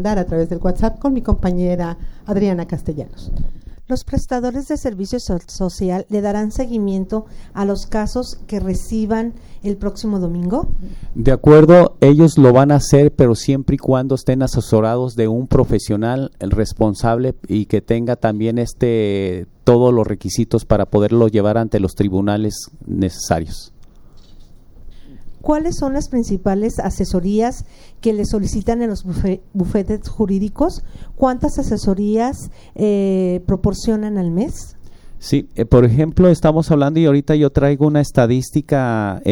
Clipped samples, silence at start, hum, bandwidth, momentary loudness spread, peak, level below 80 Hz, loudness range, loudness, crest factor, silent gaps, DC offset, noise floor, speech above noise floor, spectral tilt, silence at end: under 0.1%; 0 s; none; 17 kHz; 12 LU; 0 dBFS; -28 dBFS; 10 LU; -16 LUFS; 16 dB; none; under 0.1%; -40 dBFS; 24 dB; -7.5 dB/octave; 0 s